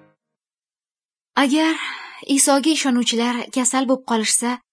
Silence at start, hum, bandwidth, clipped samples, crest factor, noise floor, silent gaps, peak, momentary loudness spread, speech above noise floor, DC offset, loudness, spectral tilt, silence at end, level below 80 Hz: 1.35 s; none; 11 kHz; under 0.1%; 18 dB; under -90 dBFS; none; -4 dBFS; 9 LU; over 71 dB; under 0.1%; -18 LUFS; -1.5 dB/octave; 0.15 s; -78 dBFS